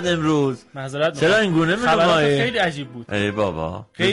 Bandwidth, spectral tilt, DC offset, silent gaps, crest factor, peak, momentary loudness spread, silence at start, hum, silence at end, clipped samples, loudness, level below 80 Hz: 11.5 kHz; -5.5 dB/octave; under 0.1%; none; 12 dB; -8 dBFS; 13 LU; 0 s; none; 0 s; under 0.1%; -19 LUFS; -50 dBFS